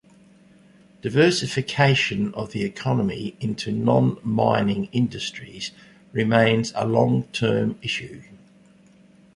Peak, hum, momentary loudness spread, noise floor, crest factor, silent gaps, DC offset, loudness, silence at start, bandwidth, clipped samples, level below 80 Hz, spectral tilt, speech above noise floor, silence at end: -2 dBFS; none; 12 LU; -53 dBFS; 20 dB; none; under 0.1%; -22 LUFS; 1.05 s; 11.5 kHz; under 0.1%; -56 dBFS; -6 dB/octave; 31 dB; 1 s